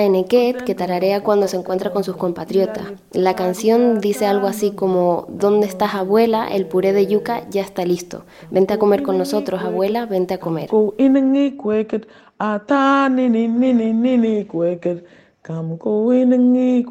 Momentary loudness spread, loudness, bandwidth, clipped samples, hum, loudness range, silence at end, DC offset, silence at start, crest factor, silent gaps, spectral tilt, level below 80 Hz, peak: 9 LU; -18 LUFS; 16 kHz; under 0.1%; none; 2 LU; 0 s; under 0.1%; 0 s; 14 dB; none; -6.5 dB/octave; -60 dBFS; -2 dBFS